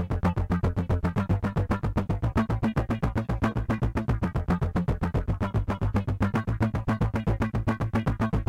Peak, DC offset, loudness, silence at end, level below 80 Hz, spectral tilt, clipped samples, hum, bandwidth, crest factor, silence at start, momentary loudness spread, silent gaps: -12 dBFS; under 0.1%; -28 LUFS; 0.05 s; -34 dBFS; -8.5 dB/octave; under 0.1%; none; 11 kHz; 14 dB; 0 s; 2 LU; none